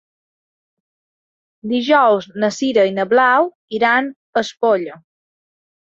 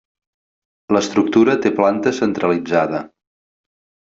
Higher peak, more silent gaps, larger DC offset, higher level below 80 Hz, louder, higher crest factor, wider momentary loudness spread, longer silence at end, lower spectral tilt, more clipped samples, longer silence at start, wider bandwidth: about the same, -2 dBFS vs -2 dBFS; first, 3.55-3.68 s, 4.16-4.33 s vs none; neither; second, -66 dBFS vs -60 dBFS; about the same, -16 LUFS vs -17 LUFS; about the same, 16 dB vs 16 dB; first, 9 LU vs 5 LU; about the same, 1 s vs 1.1 s; about the same, -4.5 dB/octave vs -5.5 dB/octave; neither; first, 1.65 s vs 0.9 s; about the same, 7.8 kHz vs 7.8 kHz